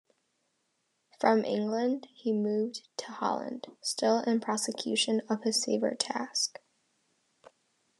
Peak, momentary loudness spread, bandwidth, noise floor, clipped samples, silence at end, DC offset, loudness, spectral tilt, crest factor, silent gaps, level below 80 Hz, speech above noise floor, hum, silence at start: -10 dBFS; 8 LU; 12 kHz; -78 dBFS; under 0.1%; 1.5 s; under 0.1%; -30 LUFS; -3 dB/octave; 22 dB; none; under -90 dBFS; 47 dB; none; 1.2 s